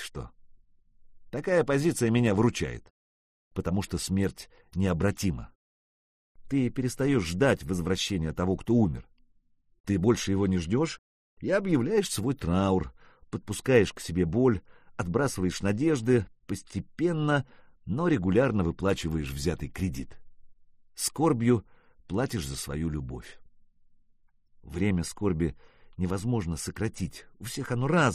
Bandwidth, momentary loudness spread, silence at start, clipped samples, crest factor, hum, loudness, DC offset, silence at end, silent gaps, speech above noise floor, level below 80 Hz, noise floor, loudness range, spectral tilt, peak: 14.5 kHz; 15 LU; 0 s; under 0.1%; 22 dB; none; -28 LUFS; under 0.1%; 0 s; 2.90-3.51 s, 5.55-6.35 s, 9.80-9.84 s, 10.98-11.37 s; 37 dB; -48 dBFS; -65 dBFS; 5 LU; -6 dB/octave; -8 dBFS